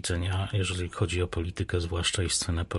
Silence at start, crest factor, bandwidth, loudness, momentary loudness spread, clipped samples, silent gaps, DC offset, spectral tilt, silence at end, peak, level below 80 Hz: 0.05 s; 16 dB; 11.5 kHz; -29 LUFS; 4 LU; under 0.1%; none; under 0.1%; -4 dB/octave; 0 s; -12 dBFS; -36 dBFS